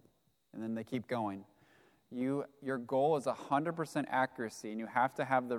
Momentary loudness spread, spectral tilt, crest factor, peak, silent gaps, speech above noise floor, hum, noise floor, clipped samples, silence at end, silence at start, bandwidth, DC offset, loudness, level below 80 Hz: 10 LU; -6 dB/octave; 22 dB; -16 dBFS; none; 37 dB; none; -72 dBFS; under 0.1%; 0 s; 0.55 s; 15.5 kHz; under 0.1%; -36 LUFS; -82 dBFS